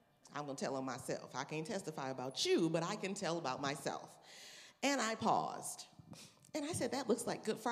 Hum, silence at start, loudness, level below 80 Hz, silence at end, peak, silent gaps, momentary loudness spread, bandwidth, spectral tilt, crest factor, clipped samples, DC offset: none; 0.25 s; -39 LUFS; -82 dBFS; 0 s; -20 dBFS; none; 18 LU; 15.5 kHz; -4 dB/octave; 20 dB; under 0.1%; under 0.1%